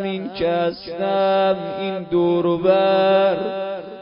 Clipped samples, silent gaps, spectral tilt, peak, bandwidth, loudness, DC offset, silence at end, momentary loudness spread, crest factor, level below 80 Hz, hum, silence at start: under 0.1%; none; -11 dB/octave; -4 dBFS; 5.4 kHz; -19 LUFS; under 0.1%; 0 s; 10 LU; 16 dB; -56 dBFS; none; 0 s